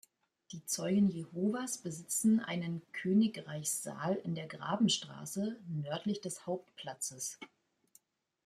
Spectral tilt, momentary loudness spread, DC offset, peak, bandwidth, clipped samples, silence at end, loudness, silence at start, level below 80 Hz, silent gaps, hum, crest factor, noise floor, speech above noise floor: -4.5 dB/octave; 11 LU; under 0.1%; -20 dBFS; 15 kHz; under 0.1%; 1 s; -35 LUFS; 0.5 s; -78 dBFS; none; none; 16 dB; -69 dBFS; 34 dB